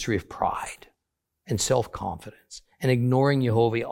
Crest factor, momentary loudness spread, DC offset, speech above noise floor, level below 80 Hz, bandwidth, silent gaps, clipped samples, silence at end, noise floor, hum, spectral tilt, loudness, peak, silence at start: 18 dB; 21 LU; under 0.1%; 57 dB; -52 dBFS; 16.5 kHz; none; under 0.1%; 0 s; -82 dBFS; none; -5.5 dB/octave; -25 LUFS; -8 dBFS; 0 s